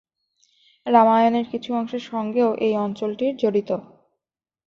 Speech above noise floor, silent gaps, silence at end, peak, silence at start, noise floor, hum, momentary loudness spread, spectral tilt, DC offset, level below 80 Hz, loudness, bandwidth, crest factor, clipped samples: 65 dB; none; 0.85 s; -4 dBFS; 0.85 s; -86 dBFS; none; 12 LU; -7 dB/octave; under 0.1%; -68 dBFS; -21 LUFS; 7 kHz; 18 dB; under 0.1%